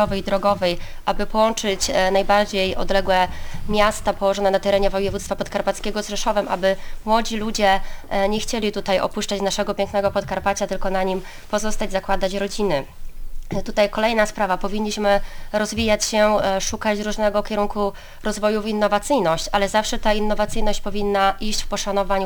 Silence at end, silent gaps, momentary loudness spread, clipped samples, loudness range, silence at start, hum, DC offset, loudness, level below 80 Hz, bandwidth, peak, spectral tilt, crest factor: 0 s; none; 7 LU; under 0.1%; 3 LU; 0 s; none; under 0.1%; -21 LUFS; -30 dBFS; over 20 kHz; -4 dBFS; -3.5 dB/octave; 16 dB